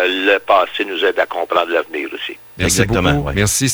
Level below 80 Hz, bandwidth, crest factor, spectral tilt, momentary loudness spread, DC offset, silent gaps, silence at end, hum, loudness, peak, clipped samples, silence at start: -36 dBFS; over 20 kHz; 16 dB; -3.5 dB/octave; 10 LU; under 0.1%; none; 0 s; none; -16 LUFS; 0 dBFS; under 0.1%; 0 s